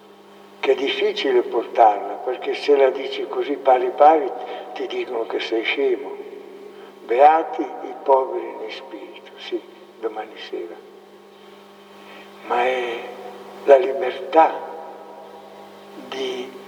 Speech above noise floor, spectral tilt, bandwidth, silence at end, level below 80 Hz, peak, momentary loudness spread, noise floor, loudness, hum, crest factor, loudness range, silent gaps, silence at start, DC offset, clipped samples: 26 dB; -4 dB/octave; 9.8 kHz; 0 s; -88 dBFS; 0 dBFS; 25 LU; -46 dBFS; -20 LUFS; 50 Hz at -55 dBFS; 20 dB; 13 LU; none; 0.6 s; under 0.1%; under 0.1%